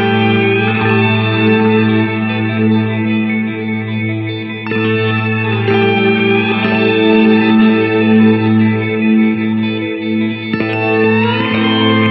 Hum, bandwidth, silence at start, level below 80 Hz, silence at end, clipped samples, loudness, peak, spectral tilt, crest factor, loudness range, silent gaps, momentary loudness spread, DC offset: none; 5.4 kHz; 0 s; -56 dBFS; 0 s; under 0.1%; -13 LUFS; 0 dBFS; -10 dB/octave; 12 dB; 5 LU; none; 8 LU; under 0.1%